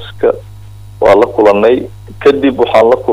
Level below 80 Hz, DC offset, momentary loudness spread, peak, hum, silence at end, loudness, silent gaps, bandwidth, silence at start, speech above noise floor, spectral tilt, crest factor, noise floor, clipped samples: -38 dBFS; under 0.1%; 7 LU; 0 dBFS; none; 0 s; -10 LUFS; none; 11.5 kHz; 0 s; 22 dB; -6.5 dB/octave; 10 dB; -31 dBFS; under 0.1%